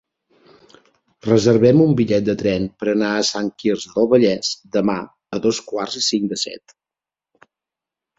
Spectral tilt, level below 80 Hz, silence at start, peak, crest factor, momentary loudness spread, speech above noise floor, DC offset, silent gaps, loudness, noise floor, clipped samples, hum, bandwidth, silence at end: -5 dB/octave; -54 dBFS; 1.25 s; -2 dBFS; 18 dB; 12 LU; 71 dB; under 0.1%; none; -18 LUFS; -89 dBFS; under 0.1%; none; 8 kHz; 1.6 s